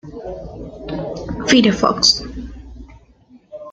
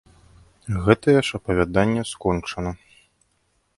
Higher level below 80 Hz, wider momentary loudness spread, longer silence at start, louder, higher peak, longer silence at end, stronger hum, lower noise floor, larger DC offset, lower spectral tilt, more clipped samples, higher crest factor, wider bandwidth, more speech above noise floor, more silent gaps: about the same, -38 dBFS vs -42 dBFS; first, 22 LU vs 14 LU; second, 0.05 s vs 0.65 s; first, -16 LUFS vs -22 LUFS; about the same, 0 dBFS vs 0 dBFS; second, 0 s vs 1.05 s; neither; second, -49 dBFS vs -68 dBFS; neither; second, -3.5 dB/octave vs -6 dB/octave; neither; about the same, 20 dB vs 22 dB; second, 9.2 kHz vs 11.5 kHz; second, 32 dB vs 47 dB; neither